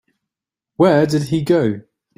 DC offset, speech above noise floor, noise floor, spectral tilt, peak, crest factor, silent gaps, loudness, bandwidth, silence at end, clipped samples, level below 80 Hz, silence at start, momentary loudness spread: under 0.1%; 71 dB; -86 dBFS; -7 dB/octave; -2 dBFS; 16 dB; none; -16 LUFS; 16 kHz; 0.35 s; under 0.1%; -54 dBFS; 0.8 s; 8 LU